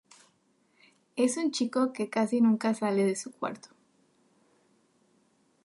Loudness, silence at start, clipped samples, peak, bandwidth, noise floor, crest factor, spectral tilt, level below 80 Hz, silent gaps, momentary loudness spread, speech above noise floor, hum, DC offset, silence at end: -29 LUFS; 1.15 s; under 0.1%; -14 dBFS; 11.5 kHz; -69 dBFS; 18 dB; -5 dB/octave; -82 dBFS; none; 12 LU; 42 dB; none; under 0.1%; 2.05 s